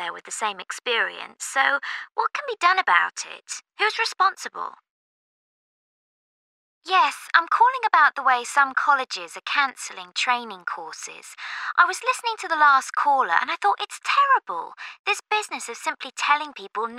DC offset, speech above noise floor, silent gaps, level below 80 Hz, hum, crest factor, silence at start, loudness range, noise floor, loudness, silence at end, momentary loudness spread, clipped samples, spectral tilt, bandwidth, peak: under 0.1%; over 67 dB; 4.91-6.81 s, 14.99-15.04 s; -88 dBFS; none; 22 dB; 0 s; 6 LU; under -90 dBFS; -22 LUFS; 0 s; 15 LU; under 0.1%; 1 dB/octave; 15 kHz; -2 dBFS